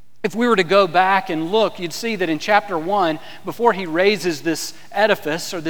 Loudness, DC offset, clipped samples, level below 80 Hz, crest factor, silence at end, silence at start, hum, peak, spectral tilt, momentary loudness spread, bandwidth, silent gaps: -19 LUFS; 2%; under 0.1%; -66 dBFS; 18 dB; 0 s; 0.25 s; none; 0 dBFS; -4 dB/octave; 10 LU; over 20 kHz; none